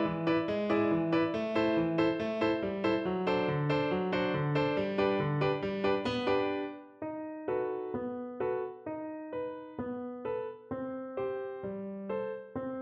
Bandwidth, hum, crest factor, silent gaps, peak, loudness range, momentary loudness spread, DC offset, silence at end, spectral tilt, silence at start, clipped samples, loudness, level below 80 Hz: 7.4 kHz; none; 16 dB; none; -18 dBFS; 8 LU; 10 LU; under 0.1%; 0 s; -8 dB/octave; 0 s; under 0.1%; -33 LUFS; -62 dBFS